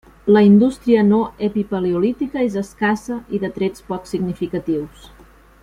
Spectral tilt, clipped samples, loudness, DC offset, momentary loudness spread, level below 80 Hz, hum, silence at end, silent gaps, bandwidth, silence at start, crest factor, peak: -7.5 dB/octave; under 0.1%; -18 LUFS; under 0.1%; 12 LU; -48 dBFS; none; 0.55 s; none; 11 kHz; 0.25 s; 16 dB; -2 dBFS